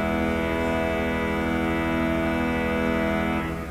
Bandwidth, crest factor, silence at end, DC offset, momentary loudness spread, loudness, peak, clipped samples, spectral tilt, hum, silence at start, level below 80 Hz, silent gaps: 16 kHz; 14 dB; 0 s; under 0.1%; 1 LU; -25 LUFS; -10 dBFS; under 0.1%; -6.5 dB/octave; none; 0 s; -36 dBFS; none